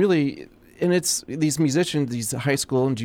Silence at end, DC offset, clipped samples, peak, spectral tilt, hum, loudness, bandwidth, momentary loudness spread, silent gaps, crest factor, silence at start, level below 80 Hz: 0 s; under 0.1%; under 0.1%; -8 dBFS; -4.5 dB/octave; none; -23 LUFS; 17.5 kHz; 6 LU; none; 14 dB; 0 s; -58 dBFS